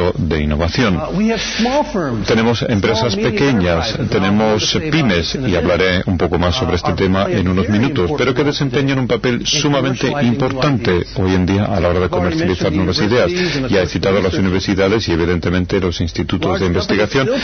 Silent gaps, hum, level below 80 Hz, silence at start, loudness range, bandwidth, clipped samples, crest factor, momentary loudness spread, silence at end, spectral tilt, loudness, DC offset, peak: none; none; -32 dBFS; 0 s; 1 LU; 6.6 kHz; under 0.1%; 12 dB; 3 LU; 0 s; -5.5 dB/octave; -15 LUFS; under 0.1%; -4 dBFS